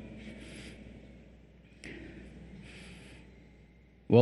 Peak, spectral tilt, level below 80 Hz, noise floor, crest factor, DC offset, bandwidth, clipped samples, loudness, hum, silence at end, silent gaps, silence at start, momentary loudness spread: -8 dBFS; -8 dB/octave; -56 dBFS; -59 dBFS; 26 dB; under 0.1%; 12 kHz; under 0.1%; -40 LUFS; none; 0 s; none; 0 s; 11 LU